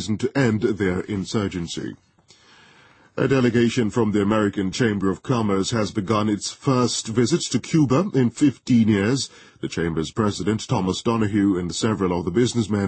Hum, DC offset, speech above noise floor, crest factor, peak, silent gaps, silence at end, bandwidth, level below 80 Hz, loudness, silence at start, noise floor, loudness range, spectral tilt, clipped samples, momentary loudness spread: none; under 0.1%; 33 dB; 16 dB; -6 dBFS; none; 0 s; 8.8 kHz; -50 dBFS; -22 LUFS; 0 s; -54 dBFS; 4 LU; -5.5 dB/octave; under 0.1%; 7 LU